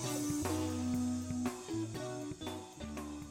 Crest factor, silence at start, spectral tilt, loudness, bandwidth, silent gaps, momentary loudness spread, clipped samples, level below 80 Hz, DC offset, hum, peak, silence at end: 16 dB; 0 s; -5 dB/octave; -39 LUFS; 16.5 kHz; none; 9 LU; under 0.1%; -58 dBFS; under 0.1%; none; -22 dBFS; 0 s